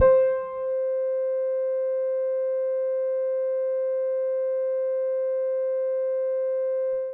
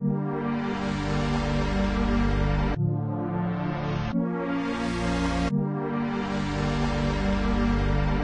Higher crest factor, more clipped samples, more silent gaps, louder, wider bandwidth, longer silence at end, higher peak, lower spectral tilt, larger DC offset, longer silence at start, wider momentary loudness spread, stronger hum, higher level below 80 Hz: about the same, 16 dB vs 14 dB; neither; neither; about the same, -26 LUFS vs -27 LUFS; second, 2.8 kHz vs 9.6 kHz; about the same, 0 s vs 0 s; about the same, -10 dBFS vs -12 dBFS; first, -9 dB/octave vs -7 dB/octave; neither; about the same, 0 s vs 0 s; second, 0 LU vs 3 LU; neither; second, -58 dBFS vs -32 dBFS